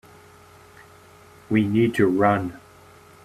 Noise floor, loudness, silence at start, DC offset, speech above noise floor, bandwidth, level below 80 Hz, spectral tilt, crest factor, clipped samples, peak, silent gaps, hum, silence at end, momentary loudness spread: -49 dBFS; -21 LUFS; 1.5 s; under 0.1%; 30 dB; 14 kHz; -60 dBFS; -7.5 dB/octave; 18 dB; under 0.1%; -6 dBFS; none; none; 0.65 s; 7 LU